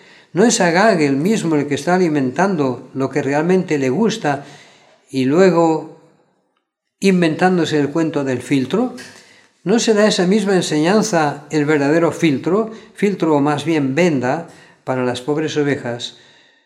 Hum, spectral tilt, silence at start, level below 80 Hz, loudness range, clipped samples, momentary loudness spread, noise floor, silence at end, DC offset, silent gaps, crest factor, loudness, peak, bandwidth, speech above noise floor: none; -5.5 dB/octave; 0.35 s; -68 dBFS; 3 LU; under 0.1%; 10 LU; -71 dBFS; 0.55 s; under 0.1%; none; 16 dB; -17 LUFS; 0 dBFS; 13.5 kHz; 55 dB